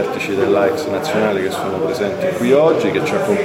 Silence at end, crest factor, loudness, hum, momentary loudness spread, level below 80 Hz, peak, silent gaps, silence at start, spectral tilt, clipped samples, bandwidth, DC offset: 0 s; 16 dB; -17 LUFS; none; 7 LU; -56 dBFS; 0 dBFS; none; 0 s; -5.5 dB/octave; under 0.1%; 16.5 kHz; under 0.1%